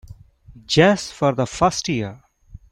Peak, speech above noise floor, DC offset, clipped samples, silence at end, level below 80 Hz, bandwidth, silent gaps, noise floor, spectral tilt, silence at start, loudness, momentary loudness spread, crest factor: -2 dBFS; 25 dB; under 0.1%; under 0.1%; 0.55 s; -46 dBFS; 12.5 kHz; none; -44 dBFS; -5 dB/octave; 0.1 s; -19 LUFS; 10 LU; 20 dB